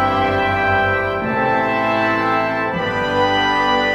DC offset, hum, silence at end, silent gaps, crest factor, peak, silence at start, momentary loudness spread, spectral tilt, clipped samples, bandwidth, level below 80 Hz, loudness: under 0.1%; none; 0 s; none; 12 dB; -4 dBFS; 0 s; 4 LU; -5.5 dB/octave; under 0.1%; 15.5 kHz; -42 dBFS; -17 LUFS